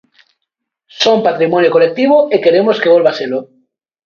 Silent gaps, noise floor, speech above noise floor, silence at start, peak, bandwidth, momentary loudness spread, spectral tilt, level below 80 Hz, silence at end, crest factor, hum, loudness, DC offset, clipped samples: none; -75 dBFS; 65 dB; 0.95 s; 0 dBFS; 7 kHz; 7 LU; -5 dB/octave; -62 dBFS; 0.6 s; 12 dB; none; -11 LUFS; under 0.1%; under 0.1%